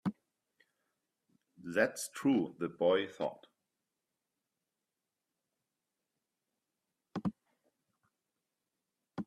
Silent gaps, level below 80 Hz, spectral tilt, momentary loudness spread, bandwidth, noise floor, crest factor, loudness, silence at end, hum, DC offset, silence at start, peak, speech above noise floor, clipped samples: none; -80 dBFS; -5 dB/octave; 12 LU; 14 kHz; -89 dBFS; 24 dB; -35 LUFS; 0.05 s; none; under 0.1%; 0.05 s; -16 dBFS; 56 dB; under 0.1%